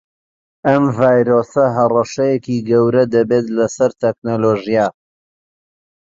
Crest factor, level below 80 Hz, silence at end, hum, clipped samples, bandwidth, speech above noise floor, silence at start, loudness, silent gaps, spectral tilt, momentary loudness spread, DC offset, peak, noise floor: 14 dB; -56 dBFS; 1.1 s; none; under 0.1%; 7.8 kHz; over 76 dB; 0.65 s; -15 LUFS; 4.18-4.22 s; -7 dB/octave; 6 LU; under 0.1%; -2 dBFS; under -90 dBFS